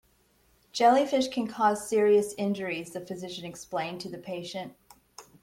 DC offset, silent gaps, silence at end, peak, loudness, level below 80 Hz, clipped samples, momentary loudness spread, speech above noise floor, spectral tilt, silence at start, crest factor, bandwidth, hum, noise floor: under 0.1%; none; 0.2 s; -10 dBFS; -28 LUFS; -68 dBFS; under 0.1%; 16 LU; 38 dB; -4.5 dB/octave; 0.75 s; 18 dB; 16.5 kHz; none; -66 dBFS